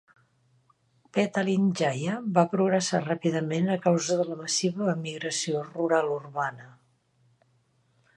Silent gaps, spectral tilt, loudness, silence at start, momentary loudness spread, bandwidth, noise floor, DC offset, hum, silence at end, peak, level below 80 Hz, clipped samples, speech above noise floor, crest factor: none; -5 dB/octave; -27 LUFS; 1.15 s; 6 LU; 11.5 kHz; -68 dBFS; under 0.1%; none; 1.45 s; -10 dBFS; -74 dBFS; under 0.1%; 41 dB; 18 dB